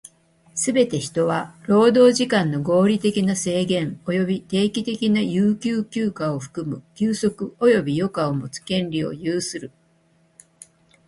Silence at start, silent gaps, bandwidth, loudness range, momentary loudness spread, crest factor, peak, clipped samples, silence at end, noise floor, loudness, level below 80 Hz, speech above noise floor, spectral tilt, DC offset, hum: 0.55 s; none; 11.5 kHz; 5 LU; 10 LU; 18 dB; -4 dBFS; under 0.1%; 1.4 s; -60 dBFS; -21 LUFS; -58 dBFS; 40 dB; -5.5 dB/octave; under 0.1%; none